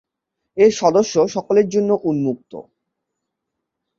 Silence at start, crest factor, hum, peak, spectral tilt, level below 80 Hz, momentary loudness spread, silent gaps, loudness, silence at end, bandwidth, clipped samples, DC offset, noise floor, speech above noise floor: 0.55 s; 18 dB; none; -2 dBFS; -5.5 dB/octave; -60 dBFS; 17 LU; none; -17 LUFS; 1.4 s; 7.6 kHz; under 0.1%; under 0.1%; -79 dBFS; 62 dB